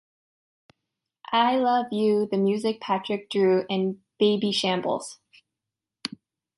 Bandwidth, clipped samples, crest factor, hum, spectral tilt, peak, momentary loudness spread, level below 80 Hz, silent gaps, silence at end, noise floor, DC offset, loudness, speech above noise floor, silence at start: 11.5 kHz; under 0.1%; 18 dB; none; -5.5 dB/octave; -8 dBFS; 12 LU; -74 dBFS; none; 0.5 s; -87 dBFS; under 0.1%; -24 LUFS; 64 dB; 1.3 s